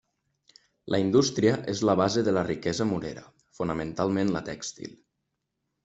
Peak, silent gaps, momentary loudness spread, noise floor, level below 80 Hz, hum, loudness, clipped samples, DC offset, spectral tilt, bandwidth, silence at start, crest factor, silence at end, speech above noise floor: -8 dBFS; none; 14 LU; -81 dBFS; -60 dBFS; none; -27 LUFS; under 0.1%; under 0.1%; -5.5 dB/octave; 8.2 kHz; 0.85 s; 20 dB; 0.9 s; 55 dB